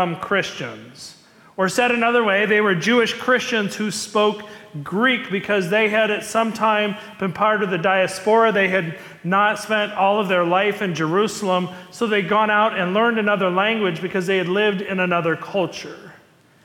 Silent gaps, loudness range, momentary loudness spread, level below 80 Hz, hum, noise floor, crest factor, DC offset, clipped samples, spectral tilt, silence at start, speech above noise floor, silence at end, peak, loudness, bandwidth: none; 2 LU; 11 LU; -66 dBFS; none; -52 dBFS; 14 dB; under 0.1%; under 0.1%; -4.5 dB/octave; 0 s; 32 dB; 0.5 s; -6 dBFS; -19 LUFS; 17.5 kHz